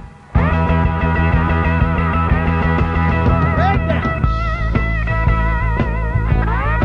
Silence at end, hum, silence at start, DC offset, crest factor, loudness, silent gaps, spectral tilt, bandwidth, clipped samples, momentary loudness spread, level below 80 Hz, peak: 0 s; none; 0 s; under 0.1%; 12 dB; -17 LUFS; none; -9 dB/octave; 6 kHz; under 0.1%; 3 LU; -20 dBFS; -4 dBFS